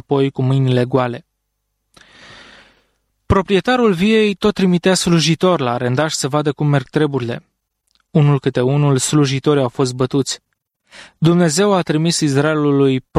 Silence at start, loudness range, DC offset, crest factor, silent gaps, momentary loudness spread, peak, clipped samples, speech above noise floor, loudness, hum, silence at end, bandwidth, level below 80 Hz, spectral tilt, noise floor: 0.1 s; 5 LU; under 0.1%; 14 dB; none; 5 LU; -2 dBFS; under 0.1%; 57 dB; -16 LUFS; none; 0 s; 14 kHz; -44 dBFS; -5.5 dB/octave; -72 dBFS